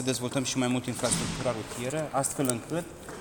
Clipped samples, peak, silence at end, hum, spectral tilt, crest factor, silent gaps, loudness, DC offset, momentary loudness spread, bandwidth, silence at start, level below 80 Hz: under 0.1%; -10 dBFS; 0 s; none; -4 dB/octave; 20 dB; none; -30 LUFS; under 0.1%; 6 LU; 19.5 kHz; 0 s; -54 dBFS